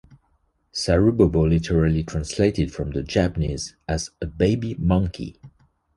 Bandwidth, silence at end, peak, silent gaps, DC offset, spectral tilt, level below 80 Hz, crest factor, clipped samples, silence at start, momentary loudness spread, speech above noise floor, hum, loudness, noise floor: 11.5 kHz; 0.5 s; -4 dBFS; none; under 0.1%; -6.5 dB/octave; -34 dBFS; 20 dB; under 0.1%; 0.1 s; 11 LU; 45 dB; none; -22 LUFS; -66 dBFS